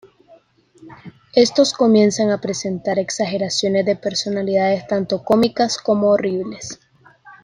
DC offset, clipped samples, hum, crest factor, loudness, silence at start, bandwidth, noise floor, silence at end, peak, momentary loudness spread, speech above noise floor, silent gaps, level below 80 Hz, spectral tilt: under 0.1%; under 0.1%; none; 16 dB; -18 LUFS; 0.8 s; 10.5 kHz; -51 dBFS; 0.1 s; -2 dBFS; 9 LU; 34 dB; none; -58 dBFS; -4.5 dB/octave